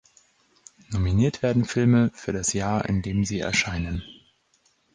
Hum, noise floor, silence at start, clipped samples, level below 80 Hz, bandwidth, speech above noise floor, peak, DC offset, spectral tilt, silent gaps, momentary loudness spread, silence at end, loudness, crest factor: none; -66 dBFS; 0.9 s; under 0.1%; -40 dBFS; 10 kHz; 43 dB; -10 dBFS; under 0.1%; -5.5 dB/octave; none; 9 LU; 0.8 s; -24 LUFS; 16 dB